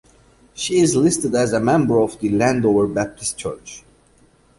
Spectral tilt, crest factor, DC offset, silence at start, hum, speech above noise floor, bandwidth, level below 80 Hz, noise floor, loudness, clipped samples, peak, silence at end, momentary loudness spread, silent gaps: -5 dB/octave; 16 dB; under 0.1%; 0.55 s; none; 37 dB; 11.5 kHz; -50 dBFS; -54 dBFS; -18 LUFS; under 0.1%; -4 dBFS; 0.8 s; 12 LU; none